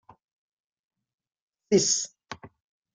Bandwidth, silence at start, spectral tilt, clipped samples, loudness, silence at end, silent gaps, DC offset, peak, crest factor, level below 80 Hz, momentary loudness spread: 10 kHz; 1.7 s; -3 dB/octave; under 0.1%; -24 LUFS; 0.45 s; none; under 0.1%; -8 dBFS; 22 dB; -70 dBFS; 22 LU